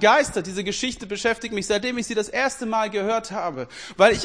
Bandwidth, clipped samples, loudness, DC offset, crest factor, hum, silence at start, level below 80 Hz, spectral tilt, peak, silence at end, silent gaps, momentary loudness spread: 10.5 kHz; under 0.1%; -23 LUFS; 0.1%; 22 dB; none; 0 s; -50 dBFS; -3 dB/octave; 0 dBFS; 0 s; none; 10 LU